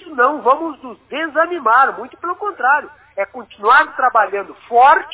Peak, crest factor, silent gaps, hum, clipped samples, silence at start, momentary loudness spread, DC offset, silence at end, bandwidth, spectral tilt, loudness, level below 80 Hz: 0 dBFS; 16 dB; none; none; under 0.1%; 0.05 s; 14 LU; under 0.1%; 0 s; 4 kHz; -6 dB/octave; -15 LUFS; -60 dBFS